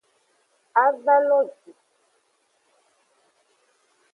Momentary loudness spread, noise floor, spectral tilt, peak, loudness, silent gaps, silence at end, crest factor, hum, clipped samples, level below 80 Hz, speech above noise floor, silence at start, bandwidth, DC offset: 6 LU; -68 dBFS; -4.5 dB/octave; -4 dBFS; -21 LUFS; none; 2.65 s; 22 dB; none; under 0.1%; under -90 dBFS; 48 dB; 0.75 s; 3.7 kHz; under 0.1%